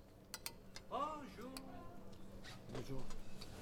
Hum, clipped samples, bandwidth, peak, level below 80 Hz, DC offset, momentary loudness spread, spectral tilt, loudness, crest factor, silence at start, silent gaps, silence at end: none; under 0.1%; 17.5 kHz; -28 dBFS; -56 dBFS; under 0.1%; 13 LU; -4.5 dB/octave; -50 LUFS; 20 dB; 0 s; none; 0 s